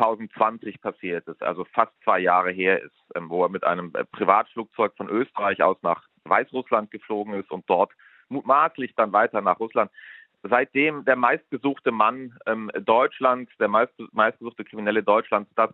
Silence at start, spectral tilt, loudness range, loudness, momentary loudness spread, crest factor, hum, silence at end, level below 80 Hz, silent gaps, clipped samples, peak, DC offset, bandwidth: 0 s; -8 dB/octave; 2 LU; -23 LUFS; 11 LU; 22 dB; none; 0.05 s; -76 dBFS; none; under 0.1%; -2 dBFS; under 0.1%; 4.2 kHz